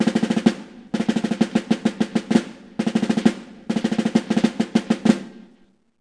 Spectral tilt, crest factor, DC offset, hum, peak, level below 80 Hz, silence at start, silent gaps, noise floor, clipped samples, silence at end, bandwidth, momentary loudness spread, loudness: -6 dB/octave; 20 dB; under 0.1%; none; 0 dBFS; -60 dBFS; 0 s; none; -57 dBFS; under 0.1%; 0.6 s; 10.5 kHz; 8 LU; -22 LUFS